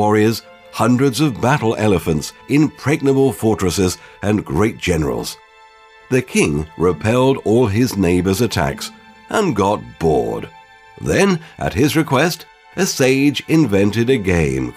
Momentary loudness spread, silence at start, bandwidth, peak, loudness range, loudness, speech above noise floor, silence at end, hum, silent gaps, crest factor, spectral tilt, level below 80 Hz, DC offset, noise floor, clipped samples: 9 LU; 0 s; 16 kHz; 0 dBFS; 3 LU; -17 LUFS; 29 dB; 0.05 s; none; none; 16 dB; -5.5 dB/octave; -40 dBFS; under 0.1%; -45 dBFS; under 0.1%